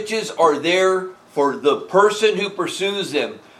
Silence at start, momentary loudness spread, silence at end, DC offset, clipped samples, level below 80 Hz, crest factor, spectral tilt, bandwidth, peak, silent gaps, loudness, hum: 0 s; 8 LU; 0.2 s; under 0.1%; under 0.1%; -74 dBFS; 18 dB; -3.5 dB/octave; 14 kHz; -2 dBFS; none; -19 LUFS; none